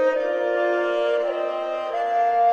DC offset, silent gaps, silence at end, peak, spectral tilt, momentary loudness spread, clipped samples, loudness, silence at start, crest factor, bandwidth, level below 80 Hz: under 0.1%; none; 0 s; -10 dBFS; -3.5 dB/octave; 5 LU; under 0.1%; -23 LUFS; 0 s; 10 dB; 8 kHz; -70 dBFS